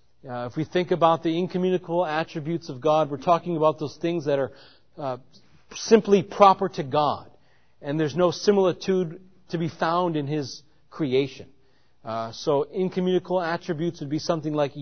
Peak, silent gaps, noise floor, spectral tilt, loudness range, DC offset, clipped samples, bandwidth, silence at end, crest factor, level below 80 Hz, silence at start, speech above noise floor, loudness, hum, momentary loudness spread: -2 dBFS; none; -64 dBFS; -6 dB/octave; 5 LU; 0.2%; under 0.1%; 6.6 kHz; 0 s; 22 dB; -64 dBFS; 0.25 s; 40 dB; -24 LUFS; none; 13 LU